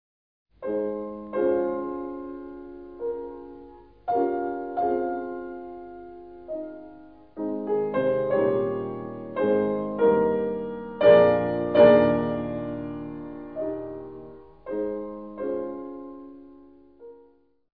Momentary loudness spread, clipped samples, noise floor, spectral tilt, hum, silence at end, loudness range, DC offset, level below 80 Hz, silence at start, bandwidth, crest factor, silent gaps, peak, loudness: 23 LU; under 0.1%; -59 dBFS; -10.5 dB/octave; none; 0.6 s; 13 LU; 0.1%; -58 dBFS; 0.6 s; 4.8 kHz; 22 dB; none; -4 dBFS; -25 LUFS